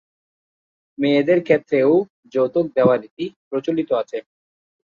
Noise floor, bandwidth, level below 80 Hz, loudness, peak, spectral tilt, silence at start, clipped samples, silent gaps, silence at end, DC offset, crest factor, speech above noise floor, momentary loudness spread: under -90 dBFS; 7 kHz; -64 dBFS; -19 LUFS; -2 dBFS; -8 dB/octave; 1 s; under 0.1%; 2.10-2.23 s, 3.11-3.17 s, 3.36-3.51 s; 0.75 s; under 0.1%; 18 dB; over 72 dB; 12 LU